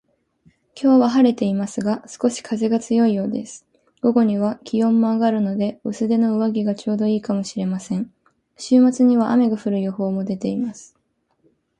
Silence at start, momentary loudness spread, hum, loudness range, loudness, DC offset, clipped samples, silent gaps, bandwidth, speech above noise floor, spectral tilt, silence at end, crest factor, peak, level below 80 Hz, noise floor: 0.75 s; 10 LU; none; 2 LU; -20 LUFS; under 0.1%; under 0.1%; none; 10 kHz; 48 dB; -7 dB/octave; 0.95 s; 16 dB; -4 dBFS; -64 dBFS; -67 dBFS